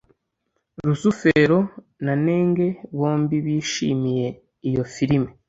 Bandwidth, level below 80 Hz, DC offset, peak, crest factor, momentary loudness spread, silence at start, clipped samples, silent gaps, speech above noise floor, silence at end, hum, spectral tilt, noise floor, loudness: 8 kHz; -52 dBFS; under 0.1%; -4 dBFS; 18 dB; 9 LU; 0.8 s; under 0.1%; none; 54 dB; 0.15 s; none; -6.5 dB/octave; -75 dBFS; -22 LUFS